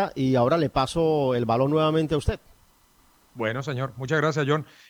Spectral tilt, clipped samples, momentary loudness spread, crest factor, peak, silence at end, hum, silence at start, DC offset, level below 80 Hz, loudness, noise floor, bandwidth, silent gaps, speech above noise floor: -6.5 dB/octave; under 0.1%; 9 LU; 16 dB; -8 dBFS; 0.25 s; none; 0 s; under 0.1%; -44 dBFS; -24 LUFS; -60 dBFS; 19.5 kHz; none; 36 dB